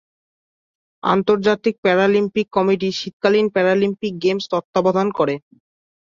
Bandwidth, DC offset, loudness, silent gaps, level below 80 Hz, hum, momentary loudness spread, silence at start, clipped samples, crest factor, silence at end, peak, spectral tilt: 7.4 kHz; under 0.1%; -18 LUFS; 1.78-1.83 s, 3.13-3.20 s, 4.64-4.73 s; -60 dBFS; none; 5 LU; 1.05 s; under 0.1%; 16 dB; 0.75 s; -4 dBFS; -6 dB/octave